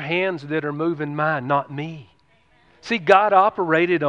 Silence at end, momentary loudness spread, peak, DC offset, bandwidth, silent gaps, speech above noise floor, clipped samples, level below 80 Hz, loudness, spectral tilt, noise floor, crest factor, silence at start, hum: 0 s; 16 LU; 0 dBFS; under 0.1%; 9 kHz; none; 39 dB; under 0.1%; -66 dBFS; -20 LUFS; -6.5 dB/octave; -59 dBFS; 20 dB; 0 s; none